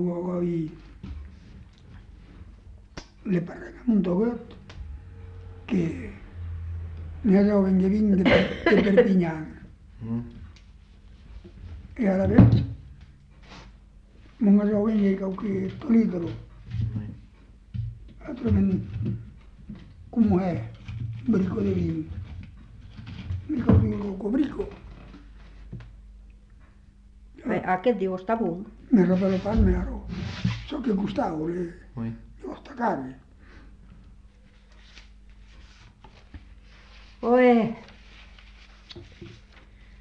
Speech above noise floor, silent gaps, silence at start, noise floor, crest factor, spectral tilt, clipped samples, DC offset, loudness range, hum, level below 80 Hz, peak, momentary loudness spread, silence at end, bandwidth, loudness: 30 dB; none; 0 s; -53 dBFS; 22 dB; -9 dB/octave; under 0.1%; under 0.1%; 11 LU; none; -42 dBFS; -4 dBFS; 24 LU; 0.05 s; 6.8 kHz; -25 LUFS